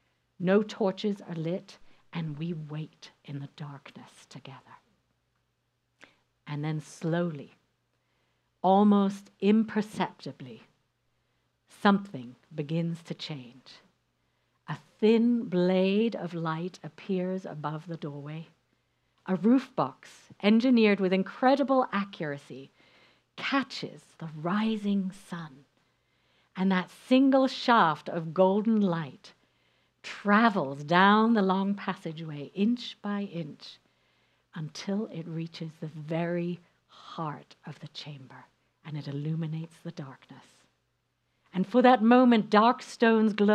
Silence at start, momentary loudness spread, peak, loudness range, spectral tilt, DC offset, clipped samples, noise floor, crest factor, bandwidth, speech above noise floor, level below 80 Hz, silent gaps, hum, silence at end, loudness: 0.4 s; 20 LU; -6 dBFS; 13 LU; -7 dB/octave; under 0.1%; under 0.1%; -77 dBFS; 22 dB; 9.8 kHz; 49 dB; -78 dBFS; none; none; 0 s; -27 LUFS